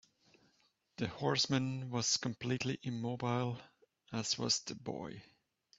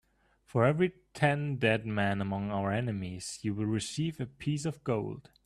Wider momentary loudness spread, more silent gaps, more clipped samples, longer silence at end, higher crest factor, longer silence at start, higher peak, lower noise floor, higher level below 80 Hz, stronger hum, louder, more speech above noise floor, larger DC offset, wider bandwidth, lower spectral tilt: first, 12 LU vs 8 LU; neither; neither; first, 0.55 s vs 0.25 s; about the same, 20 dB vs 20 dB; first, 1 s vs 0.55 s; second, -18 dBFS vs -12 dBFS; first, -75 dBFS vs -65 dBFS; second, -72 dBFS vs -62 dBFS; neither; second, -36 LUFS vs -32 LUFS; first, 38 dB vs 34 dB; neither; second, 8 kHz vs 13 kHz; second, -4 dB/octave vs -6 dB/octave